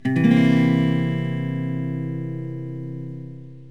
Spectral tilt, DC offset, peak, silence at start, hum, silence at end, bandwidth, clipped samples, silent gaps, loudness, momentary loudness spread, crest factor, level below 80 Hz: -8.5 dB/octave; 0.5%; -4 dBFS; 0.05 s; none; 0 s; 7.6 kHz; under 0.1%; none; -22 LUFS; 18 LU; 18 dB; -72 dBFS